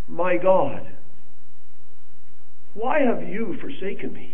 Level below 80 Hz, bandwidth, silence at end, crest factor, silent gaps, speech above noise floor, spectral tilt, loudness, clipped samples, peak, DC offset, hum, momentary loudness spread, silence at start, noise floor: -64 dBFS; 3.7 kHz; 0 s; 20 dB; none; 35 dB; -10 dB/octave; -24 LUFS; under 0.1%; -4 dBFS; 10%; none; 17 LU; 0.1 s; -59 dBFS